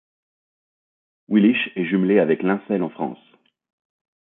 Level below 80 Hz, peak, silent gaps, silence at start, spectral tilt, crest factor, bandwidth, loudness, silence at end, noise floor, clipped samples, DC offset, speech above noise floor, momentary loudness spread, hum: -70 dBFS; -4 dBFS; none; 1.3 s; -11.5 dB/octave; 18 dB; 4 kHz; -20 LUFS; 1.2 s; under -90 dBFS; under 0.1%; under 0.1%; over 70 dB; 10 LU; none